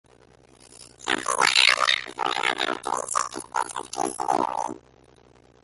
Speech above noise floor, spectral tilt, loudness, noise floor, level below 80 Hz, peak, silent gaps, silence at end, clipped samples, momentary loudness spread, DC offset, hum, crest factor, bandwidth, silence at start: 28 dB; -0.5 dB/octave; -23 LUFS; -55 dBFS; -62 dBFS; -2 dBFS; none; 0.85 s; under 0.1%; 14 LU; under 0.1%; none; 24 dB; 12 kHz; 0.8 s